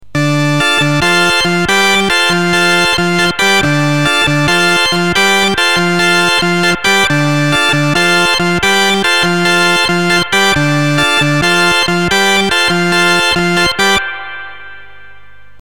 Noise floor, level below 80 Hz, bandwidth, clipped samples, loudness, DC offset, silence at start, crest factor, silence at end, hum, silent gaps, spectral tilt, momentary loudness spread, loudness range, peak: -42 dBFS; -40 dBFS; 18 kHz; under 0.1%; -10 LUFS; 3%; 0 s; 10 dB; 0.75 s; 50 Hz at -40 dBFS; none; -3.5 dB/octave; 2 LU; 0 LU; 0 dBFS